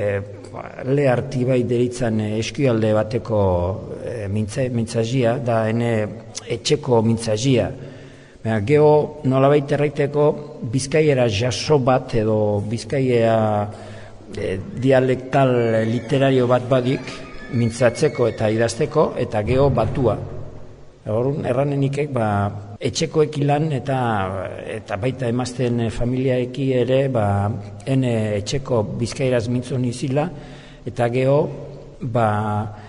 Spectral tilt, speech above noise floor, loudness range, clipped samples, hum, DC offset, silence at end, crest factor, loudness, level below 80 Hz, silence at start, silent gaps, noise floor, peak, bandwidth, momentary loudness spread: -6.5 dB/octave; 22 dB; 4 LU; under 0.1%; none; under 0.1%; 0 s; 16 dB; -20 LUFS; -44 dBFS; 0 s; none; -41 dBFS; -4 dBFS; 10.5 kHz; 12 LU